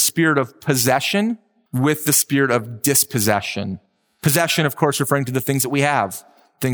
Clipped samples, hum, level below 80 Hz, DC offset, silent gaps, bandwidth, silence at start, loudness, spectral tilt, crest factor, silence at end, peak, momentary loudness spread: under 0.1%; none; -64 dBFS; under 0.1%; none; over 20 kHz; 0 s; -18 LUFS; -4 dB/octave; 16 dB; 0 s; -2 dBFS; 11 LU